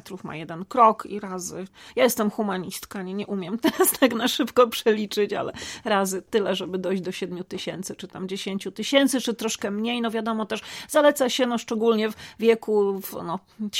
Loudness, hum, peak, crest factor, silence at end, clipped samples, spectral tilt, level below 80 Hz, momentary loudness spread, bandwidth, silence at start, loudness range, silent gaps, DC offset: -24 LUFS; none; -4 dBFS; 20 dB; 0 s; under 0.1%; -3.5 dB/octave; -64 dBFS; 13 LU; 17 kHz; 0.05 s; 4 LU; none; under 0.1%